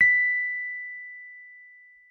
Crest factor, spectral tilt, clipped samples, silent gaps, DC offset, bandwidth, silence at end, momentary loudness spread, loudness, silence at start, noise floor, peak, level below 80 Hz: 18 dB; -2.5 dB/octave; under 0.1%; none; under 0.1%; 6.4 kHz; 0.45 s; 24 LU; -24 LUFS; 0 s; -52 dBFS; -10 dBFS; -66 dBFS